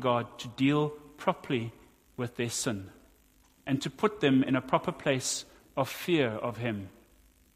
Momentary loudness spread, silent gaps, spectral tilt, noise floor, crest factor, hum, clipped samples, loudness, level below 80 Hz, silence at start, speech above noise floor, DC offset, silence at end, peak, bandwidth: 13 LU; none; -5 dB/octave; -63 dBFS; 22 dB; none; under 0.1%; -31 LUFS; -64 dBFS; 0 s; 33 dB; under 0.1%; 0.65 s; -10 dBFS; 15.5 kHz